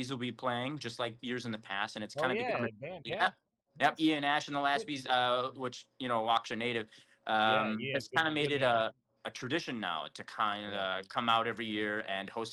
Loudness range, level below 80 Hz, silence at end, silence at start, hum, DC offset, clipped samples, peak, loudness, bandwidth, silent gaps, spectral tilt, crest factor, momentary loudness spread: 3 LU; -76 dBFS; 0 s; 0 s; none; under 0.1%; under 0.1%; -16 dBFS; -33 LUFS; 12.5 kHz; none; -4.5 dB/octave; 18 dB; 10 LU